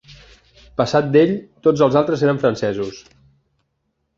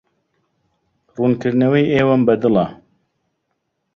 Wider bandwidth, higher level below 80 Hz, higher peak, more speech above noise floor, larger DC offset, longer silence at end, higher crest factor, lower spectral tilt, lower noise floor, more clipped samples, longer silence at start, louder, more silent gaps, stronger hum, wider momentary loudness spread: about the same, 7.4 kHz vs 6.8 kHz; about the same, -52 dBFS vs -54 dBFS; about the same, -2 dBFS vs -2 dBFS; about the same, 54 dB vs 57 dB; neither; about the same, 1.15 s vs 1.2 s; about the same, 18 dB vs 16 dB; second, -7 dB/octave vs -8.5 dB/octave; about the same, -71 dBFS vs -72 dBFS; neither; second, 0.1 s vs 1.2 s; about the same, -17 LUFS vs -16 LUFS; neither; neither; first, 10 LU vs 7 LU